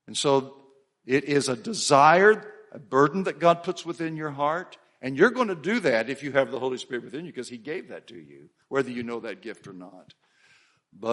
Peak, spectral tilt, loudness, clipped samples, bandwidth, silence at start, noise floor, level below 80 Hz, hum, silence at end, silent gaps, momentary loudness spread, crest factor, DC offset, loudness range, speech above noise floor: -4 dBFS; -4.5 dB/octave; -24 LUFS; under 0.1%; 11.5 kHz; 0.1 s; -61 dBFS; -72 dBFS; none; 0 s; none; 20 LU; 22 dB; under 0.1%; 13 LU; 36 dB